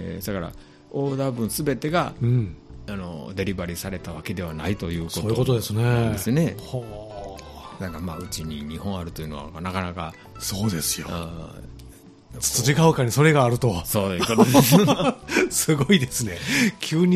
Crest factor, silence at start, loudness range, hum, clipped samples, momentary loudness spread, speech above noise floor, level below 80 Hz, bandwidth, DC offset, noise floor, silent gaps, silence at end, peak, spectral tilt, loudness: 20 dB; 0 s; 11 LU; none; under 0.1%; 17 LU; 23 dB; -44 dBFS; 15.5 kHz; under 0.1%; -46 dBFS; none; 0 s; -2 dBFS; -5 dB/octave; -23 LUFS